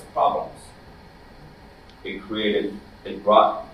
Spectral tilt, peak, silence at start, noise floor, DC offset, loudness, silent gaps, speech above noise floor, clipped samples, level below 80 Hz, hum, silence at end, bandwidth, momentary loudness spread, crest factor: -5.5 dB/octave; -2 dBFS; 0 s; -47 dBFS; under 0.1%; -22 LUFS; none; 25 dB; under 0.1%; -52 dBFS; none; 0 s; 12 kHz; 21 LU; 22 dB